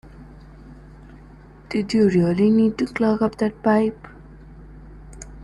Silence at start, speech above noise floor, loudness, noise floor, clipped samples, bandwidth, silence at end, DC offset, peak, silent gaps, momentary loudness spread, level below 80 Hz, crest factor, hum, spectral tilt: 0.05 s; 26 dB; -20 LUFS; -44 dBFS; under 0.1%; 11 kHz; 0 s; under 0.1%; -6 dBFS; none; 14 LU; -46 dBFS; 16 dB; none; -7.5 dB/octave